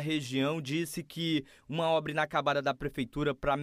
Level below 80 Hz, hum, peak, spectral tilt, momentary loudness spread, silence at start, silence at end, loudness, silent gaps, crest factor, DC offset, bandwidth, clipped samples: -54 dBFS; none; -14 dBFS; -5.5 dB/octave; 6 LU; 0 s; 0 s; -32 LUFS; none; 16 dB; under 0.1%; 15.5 kHz; under 0.1%